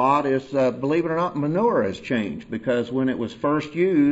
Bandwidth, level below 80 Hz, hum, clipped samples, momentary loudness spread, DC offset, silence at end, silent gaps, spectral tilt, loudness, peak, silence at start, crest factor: 8 kHz; -58 dBFS; none; under 0.1%; 5 LU; under 0.1%; 0 s; none; -7.5 dB/octave; -23 LUFS; -6 dBFS; 0 s; 16 dB